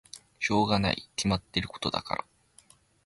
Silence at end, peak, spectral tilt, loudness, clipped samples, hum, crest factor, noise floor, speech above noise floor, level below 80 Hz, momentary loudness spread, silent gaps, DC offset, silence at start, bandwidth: 0.85 s; -12 dBFS; -4.5 dB/octave; -29 LUFS; under 0.1%; none; 20 dB; -60 dBFS; 31 dB; -50 dBFS; 10 LU; none; under 0.1%; 0.15 s; 11.5 kHz